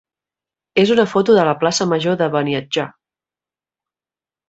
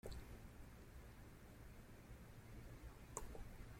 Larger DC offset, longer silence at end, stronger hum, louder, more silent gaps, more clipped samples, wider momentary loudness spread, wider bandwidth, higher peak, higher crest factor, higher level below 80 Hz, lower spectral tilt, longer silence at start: neither; first, 1.6 s vs 0 s; neither; first, -16 LUFS vs -59 LUFS; neither; neither; about the same, 9 LU vs 8 LU; second, 8.2 kHz vs 16.5 kHz; first, 0 dBFS vs -26 dBFS; second, 18 dB vs 30 dB; about the same, -60 dBFS vs -60 dBFS; about the same, -5 dB/octave vs -4.5 dB/octave; first, 0.75 s vs 0.05 s